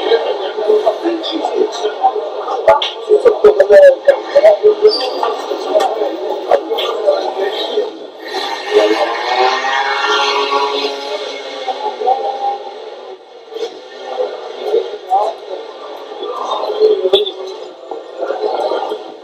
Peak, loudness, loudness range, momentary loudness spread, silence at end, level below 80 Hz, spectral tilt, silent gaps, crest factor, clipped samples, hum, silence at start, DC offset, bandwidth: 0 dBFS; -14 LUFS; 11 LU; 17 LU; 0 s; -58 dBFS; -2 dB/octave; none; 14 dB; 0.4%; none; 0 s; under 0.1%; 14 kHz